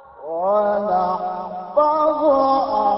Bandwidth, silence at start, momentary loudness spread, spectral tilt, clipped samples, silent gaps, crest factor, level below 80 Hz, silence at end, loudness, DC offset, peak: 5.8 kHz; 0.15 s; 9 LU; -10.5 dB/octave; under 0.1%; none; 14 dB; -56 dBFS; 0 s; -19 LUFS; under 0.1%; -6 dBFS